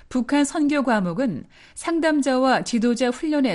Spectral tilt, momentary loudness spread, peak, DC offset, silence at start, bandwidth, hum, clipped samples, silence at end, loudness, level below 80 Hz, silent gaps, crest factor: -5 dB/octave; 7 LU; -8 dBFS; under 0.1%; 0.1 s; 11.5 kHz; none; under 0.1%; 0 s; -21 LUFS; -52 dBFS; none; 14 dB